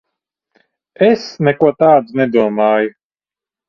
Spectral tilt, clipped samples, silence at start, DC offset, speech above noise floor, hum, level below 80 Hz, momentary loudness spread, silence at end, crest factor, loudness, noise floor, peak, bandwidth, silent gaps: -7.5 dB/octave; under 0.1%; 1 s; under 0.1%; over 77 dB; none; -58 dBFS; 5 LU; 0.8 s; 16 dB; -13 LUFS; under -90 dBFS; 0 dBFS; 7 kHz; none